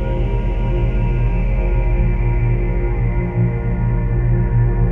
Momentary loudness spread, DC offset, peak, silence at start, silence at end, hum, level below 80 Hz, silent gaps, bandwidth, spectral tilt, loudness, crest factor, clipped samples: 3 LU; under 0.1%; -6 dBFS; 0 s; 0 s; none; -18 dBFS; none; 3.2 kHz; -10.5 dB/octave; -19 LUFS; 10 dB; under 0.1%